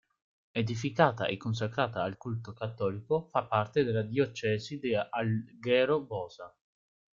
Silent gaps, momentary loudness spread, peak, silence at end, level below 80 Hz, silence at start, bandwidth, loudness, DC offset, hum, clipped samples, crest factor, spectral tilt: none; 12 LU; -8 dBFS; 0.7 s; -66 dBFS; 0.55 s; 7.6 kHz; -31 LUFS; under 0.1%; none; under 0.1%; 24 dB; -6.5 dB/octave